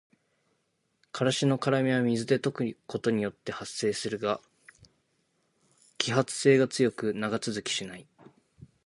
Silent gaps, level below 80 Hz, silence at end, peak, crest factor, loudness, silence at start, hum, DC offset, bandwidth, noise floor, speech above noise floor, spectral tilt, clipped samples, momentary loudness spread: none; -70 dBFS; 0.2 s; -4 dBFS; 26 dB; -28 LUFS; 1.15 s; none; under 0.1%; 11.5 kHz; -76 dBFS; 48 dB; -5 dB/octave; under 0.1%; 11 LU